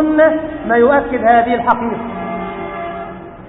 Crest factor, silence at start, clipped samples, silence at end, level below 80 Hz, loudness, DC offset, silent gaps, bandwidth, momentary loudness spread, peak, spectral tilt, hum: 14 dB; 0 s; under 0.1%; 0 s; -42 dBFS; -15 LUFS; under 0.1%; none; 4 kHz; 13 LU; 0 dBFS; -9.5 dB/octave; none